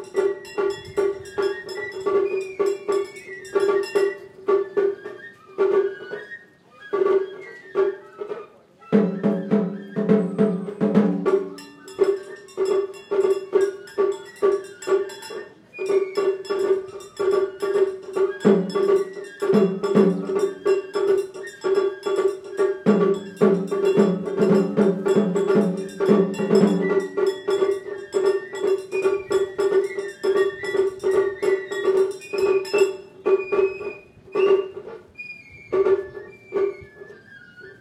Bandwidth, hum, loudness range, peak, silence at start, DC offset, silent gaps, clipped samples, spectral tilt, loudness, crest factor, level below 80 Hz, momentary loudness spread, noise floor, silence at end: 12.5 kHz; none; 5 LU; -2 dBFS; 0 s; under 0.1%; none; under 0.1%; -7 dB/octave; -22 LUFS; 20 dB; -66 dBFS; 15 LU; -47 dBFS; 0.1 s